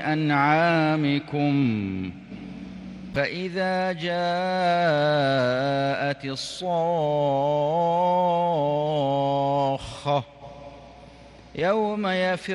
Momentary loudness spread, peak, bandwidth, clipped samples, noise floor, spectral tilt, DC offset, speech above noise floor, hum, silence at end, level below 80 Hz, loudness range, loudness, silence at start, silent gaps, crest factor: 17 LU; -8 dBFS; 11.5 kHz; under 0.1%; -47 dBFS; -6.5 dB/octave; under 0.1%; 24 dB; none; 0 s; -56 dBFS; 4 LU; -24 LUFS; 0 s; none; 16 dB